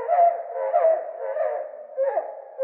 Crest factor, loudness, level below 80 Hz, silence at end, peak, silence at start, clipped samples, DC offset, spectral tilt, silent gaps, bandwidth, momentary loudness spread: 14 dB; -24 LUFS; under -90 dBFS; 0 s; -10 dBFS; 0 s; under 0.1%; under 0.1%; -4.5 dB/octave; none; 3 kHz; 12 LU